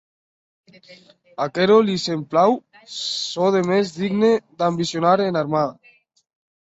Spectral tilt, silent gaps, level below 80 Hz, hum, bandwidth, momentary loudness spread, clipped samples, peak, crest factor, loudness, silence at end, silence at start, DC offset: -5.5 dB/octave; none; -64 dBFS; none; 8 kHz; 11 LU; under 0.1%; -2 dBFS; 18 dB; -20 LUFS; 0.9 s; 0.9 s; under 0.1%